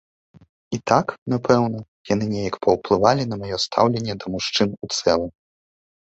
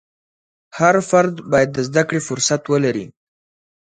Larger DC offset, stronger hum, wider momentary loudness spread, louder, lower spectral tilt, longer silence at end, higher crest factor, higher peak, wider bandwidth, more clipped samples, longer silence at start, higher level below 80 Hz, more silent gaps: neither; neither; about the same, 8 LU vs 9 LU; second, -21 LUFS vs -17 LUFS; about the same, -5 dB/octave vs -4.5 dB/octave; about the same, 0.85 s vs 0.9 s; about the same, 22 dB vs 18 dB; about the same, 0 dBFS vs 0 dBFS; second, 8.2 kHz vs 9.6 kHz; neither; about the same, 0.7 s vs 0.75 s; first, -52 dBFS vs -58 dBFS; first, 1.18-1.26 s, 1.88-2.04 s vs none